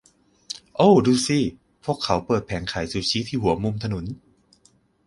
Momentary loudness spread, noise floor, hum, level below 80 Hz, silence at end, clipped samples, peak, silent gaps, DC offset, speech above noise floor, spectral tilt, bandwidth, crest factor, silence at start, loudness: 17 LU; -61 dBFS; none; -46 dBFS; 0.95 s; under 0.1%; -4 dBFS; none; under 0.1%; 39 dB; -5.5 dB/octave; 11.5 kHz; 20 dB; 0.5 s; -22 LUFS